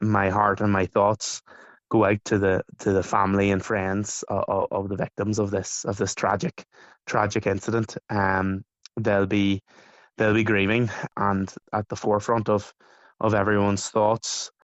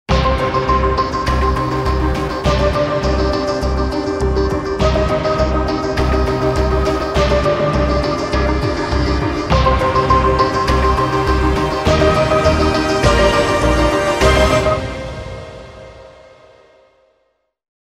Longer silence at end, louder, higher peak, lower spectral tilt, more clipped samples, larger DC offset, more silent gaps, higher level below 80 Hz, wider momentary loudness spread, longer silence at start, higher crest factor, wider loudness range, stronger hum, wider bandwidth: second, 0.15 s vs 1.8 s; second, -24 LUFS vs -15 LUFS; second, -6 dBFS vs 0 dBFS; about the same, -5.5 dB/octave vs -6 dB/octave; neither; neither; neither; second, -56 dBFS vs -22 dBFS; first, 8 LU vs 5 LU; about the same, 0 s vs 0.1 s; first, 20 dB vs 14 dB; about the same, 3 LU vs 3 LU; neither; second, 8.2 kHz vs 13.5 kHz